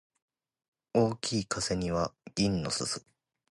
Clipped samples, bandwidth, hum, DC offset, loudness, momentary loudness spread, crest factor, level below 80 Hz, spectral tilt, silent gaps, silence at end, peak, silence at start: under 0.1%; 11.5 kHz; none; under 0.1%; -31 LUFS; 5 LU; 20 dB; -54 dBFS; -4.5 dB/octave; none; 0.5 s; -12 dBFS; 0.95 s